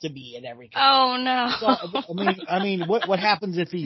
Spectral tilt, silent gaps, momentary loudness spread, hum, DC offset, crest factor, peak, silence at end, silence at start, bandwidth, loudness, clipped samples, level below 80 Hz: -6 dB/octave; none; 16 LU; none; under 0.1%; 18 dB; -4 dBFS; 0 s; 0 s; 6 kHz; -22 LUFS; under 0.1%; -68 dBFS